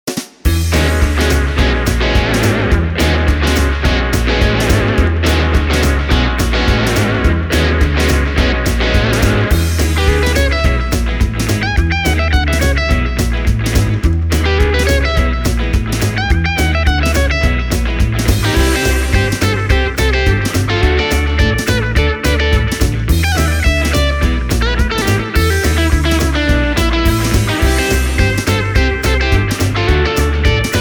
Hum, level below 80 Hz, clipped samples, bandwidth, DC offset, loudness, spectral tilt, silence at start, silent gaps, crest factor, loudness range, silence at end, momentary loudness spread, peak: none; -16 dBFS; under 0.1%; over 20 kHz; under 0.1%; -14 LUFS; -5 dB/octave; 0.05 s; none; 12 dB; 1 LU; 0 s; 3 LU; 0 dBFS